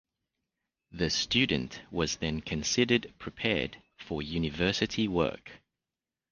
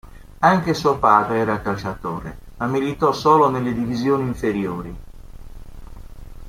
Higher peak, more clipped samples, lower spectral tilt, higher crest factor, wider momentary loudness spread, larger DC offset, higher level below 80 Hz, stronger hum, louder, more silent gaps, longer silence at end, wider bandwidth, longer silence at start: second, -10 dBFS vs -2 dBFS; neither; second, -4 dB/octave vs -6.5 dB/octave; about the same, 22 dB vs 20 dB; about the same, 12 LU vs 14 LU; neither; second, -50 dBFS vs -40 dBFS; neither; second, -30 LUFS vs -19 LUFS; neither; first, 0.75 s vs 0 s; second, 10 kHz vs 16 kHz; first, 0.9 s vs 0.05 s